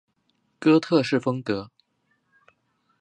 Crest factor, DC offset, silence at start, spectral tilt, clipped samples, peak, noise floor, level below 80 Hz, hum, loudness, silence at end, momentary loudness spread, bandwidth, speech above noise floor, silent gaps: 20 dB; under 0.1%; 0.6 s; -6.5 dB/octave; under 0.1%; -6 dBFS; -71 dBFS; -66 dBFS; none; -23 LUFS; 1.35 s; 11 LU; 9.6 kHz; 50 dB; none